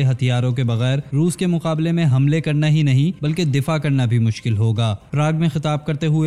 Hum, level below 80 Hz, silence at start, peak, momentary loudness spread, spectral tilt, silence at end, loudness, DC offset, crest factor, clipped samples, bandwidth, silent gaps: none; -52 dBFS; 0 s; -8 dBFS; 4 LU; -7 dB/octave; 0 s; -19 LUFS; 0.3%; 10 dB; under 0.1%; 12.5 kHz; none